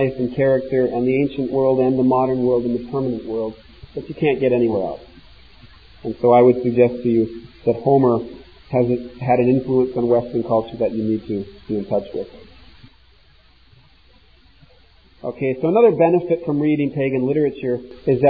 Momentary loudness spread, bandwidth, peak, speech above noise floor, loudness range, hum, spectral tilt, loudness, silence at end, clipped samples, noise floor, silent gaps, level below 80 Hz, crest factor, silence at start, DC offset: 13 LU; 5 kHz; -2 dBFS; 35 dB; 10 LU; none; -11 dB/octave; -19 LUFS; 0 s; under 0.1%; -53 dBFS; none; -50 dBFS; 18 dB; 0 s; 0.2%